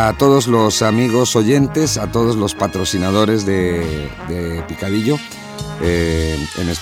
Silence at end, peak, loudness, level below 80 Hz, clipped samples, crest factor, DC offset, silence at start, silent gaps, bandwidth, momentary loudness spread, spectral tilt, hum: 0 s; -2 dBFS; -16 LUFS; -34 dBFS; under 0.1%; 14 dB; under 0.1%; 0 s; none; 17.5 kHz; 11 LU; -5 dB/octave; none